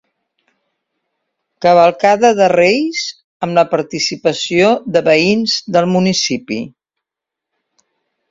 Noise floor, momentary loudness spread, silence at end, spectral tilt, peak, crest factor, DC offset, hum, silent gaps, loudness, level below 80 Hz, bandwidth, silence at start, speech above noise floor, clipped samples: -83 dBFS; 11 LU; 1.6 s; -4.5 dB/octave; 0 dBFS; 16 dB; under 0.1%; none; 3.24-3.40 s; -13 LUFS; -58 dBFS; 7.8 kHz; 1.6 s; 70 dB; under 0.1%